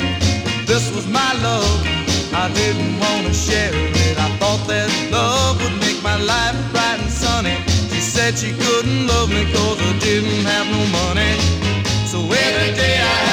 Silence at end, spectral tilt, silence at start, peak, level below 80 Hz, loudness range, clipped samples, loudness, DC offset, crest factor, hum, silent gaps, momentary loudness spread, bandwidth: 0 s; -4 dB/octave; 0 s; -4 dBFS; -30 dBFS; 1 LU; under 0.1%; -17 LUFS; under 0.1%; 14 dB; none; none; 3 LU; 16.5 kHz